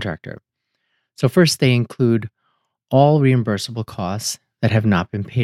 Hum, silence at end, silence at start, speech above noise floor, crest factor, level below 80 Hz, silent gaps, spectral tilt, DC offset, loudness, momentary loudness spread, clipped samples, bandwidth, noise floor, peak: none; 0 s; 0 s; 54 dB; 18 dB; -56 dBFS; none; -6 dB/octave; under 0.1%; -18 LUFS; 12 LU; under 0.1%; 15 kHz; -72 dBFS; -2 dBFS